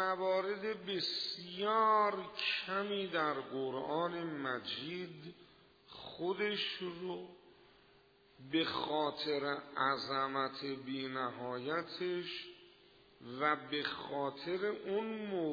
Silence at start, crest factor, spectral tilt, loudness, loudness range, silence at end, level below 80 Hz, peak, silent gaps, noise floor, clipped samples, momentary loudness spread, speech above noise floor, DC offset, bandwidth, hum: 0 s; 20 dB; -2 dB/octave; -37 LUFS; 6 LU; 0 s; -78 dBFS; -18 dBFS; none; -66 dBFS; under 0.1%; 10 LU; 29 dB; under 0.1%; 5 kHz; none